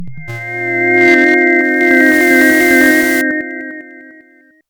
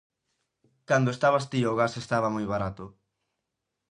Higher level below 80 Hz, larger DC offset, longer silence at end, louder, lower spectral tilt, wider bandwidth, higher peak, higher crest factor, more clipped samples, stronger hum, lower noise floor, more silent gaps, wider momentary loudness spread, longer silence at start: first, -50 dBFS vs -58 dBFS; neither; second, 0.6 s vs 1 s; first, -9 LUFS vs -27 LUFS; second, -4 dB/octave vs -6 dB/octave; first, over 20 kHz vs 11 kHz; first, 0 dBFS vs -10 dBFS; second, 12 dB vs 20 dB; neither; neither; second, -46 dBFS vs -83 dBFS; neither; first, 17 LU vs 11 LU; second, 0 s vs 0.9 s